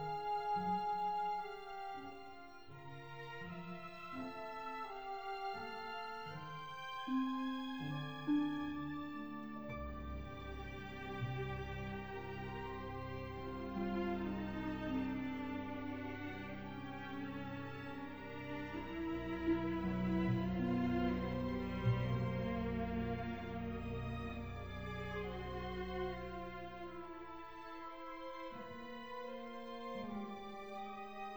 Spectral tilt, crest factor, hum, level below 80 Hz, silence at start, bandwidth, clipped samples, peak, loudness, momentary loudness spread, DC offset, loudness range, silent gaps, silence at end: -8 dB/octave; 18 dB; none; -56 dBFS; 0 s; over 20 kHz; under 0.1%; -24 dBFS; -43 LUFS; 11 LU; 0.1%; 9 LU; none; 0 s